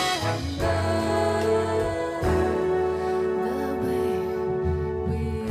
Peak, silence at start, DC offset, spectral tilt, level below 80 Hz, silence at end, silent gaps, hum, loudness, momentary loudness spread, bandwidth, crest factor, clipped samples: -12 dBFS; 0 s; under 0.1%; -6 dB/octave; -38 dBFS; 0 s; none; none; -25 LUFS; 4 LU; 15 kHz; 12 dB; under 0.1%